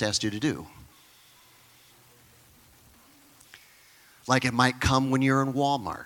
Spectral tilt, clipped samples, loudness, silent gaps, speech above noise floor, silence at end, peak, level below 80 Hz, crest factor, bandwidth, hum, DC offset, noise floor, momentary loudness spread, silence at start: -4.5 dB/octave; under 0.1%; -25 LUFS; none; 31 dB; 0 s; -6 dBFS; -52 dBFS; 22 dB; 18 kHz; none; under 0.1%; -57 dBFS; 12 LU; 0 s